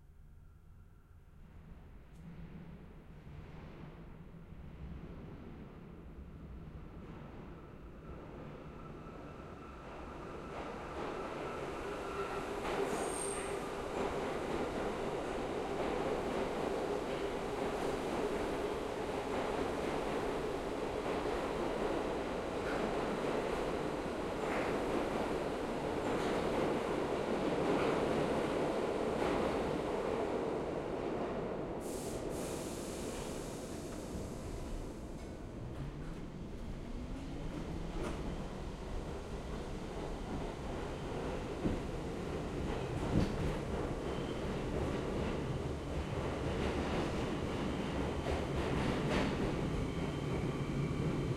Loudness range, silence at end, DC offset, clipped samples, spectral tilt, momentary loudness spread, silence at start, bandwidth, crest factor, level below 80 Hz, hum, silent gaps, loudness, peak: 16 LU; 0 s; under 0.1%; under 0.1%; -6 dB/octave; 16 LU; 0 s; 16 kHz; 20 dB; -50 dBFS; none; none; -38 LUFS; -20 dBFS